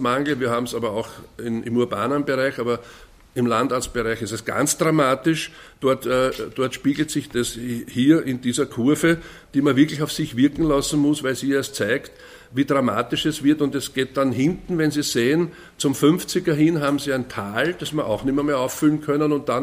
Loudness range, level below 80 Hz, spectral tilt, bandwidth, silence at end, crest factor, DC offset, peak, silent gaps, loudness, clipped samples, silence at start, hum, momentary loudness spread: 3 LU; -48 dBFS; -5 dB/octave; 16 kHz; 0 s; 18 dB; under 0.1%; -4 dBFS; none; -22 LUFS; under 0.1%; 0 s; none; 8 LU